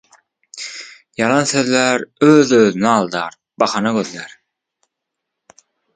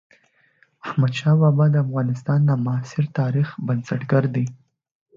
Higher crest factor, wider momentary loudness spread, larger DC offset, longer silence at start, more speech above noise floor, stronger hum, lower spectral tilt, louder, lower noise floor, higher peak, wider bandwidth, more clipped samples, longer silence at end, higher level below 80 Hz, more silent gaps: about the same, 18 dB vs 14 dB; first, 21 LU vs 9 LU; neither; second, 0.55 s vs 0.85 s; first, 64 dB vs 41 dB; neither; second, -4.5 dB/octave vs -8.5 dB/octave; first, -15 LUFS vs -21 LUFS; first, -79 dBFS vs -60 dBFS; first, 0 dBFS vs -6 dBFS; first, 9.6 kHz vs 7.4 kHz; neither; first, 1.7 s vs 0.65 s; about the same, -62 dBFS vs -62 dBFS; neither